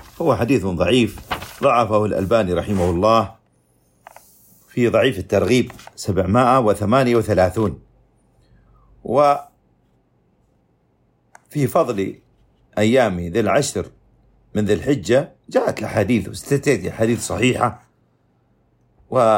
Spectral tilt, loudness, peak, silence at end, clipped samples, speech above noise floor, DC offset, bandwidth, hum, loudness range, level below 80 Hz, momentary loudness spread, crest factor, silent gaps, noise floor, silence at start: -6 dB/octave; -19 LUFS; -2 dBFS; 0 s; under 0.1%; 44 dB; under 0.1%; 16.5 kHz; none; 6 LU; -46 dBFS; 11 LU; 16 dB; none; -61 dBFS; 0.2 s